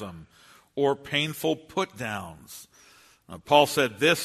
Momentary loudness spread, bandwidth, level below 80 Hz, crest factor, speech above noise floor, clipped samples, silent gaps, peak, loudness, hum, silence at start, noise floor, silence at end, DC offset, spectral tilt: 23 LU; 13.5 kHz; -64 dBFS; 24 dB; 30 dB; under 0.1%; none; -4 dBFS; -25 LUFS; none; 0 s; -56 dBFS; 0 s; under 0.1%; -3.5 dB/octave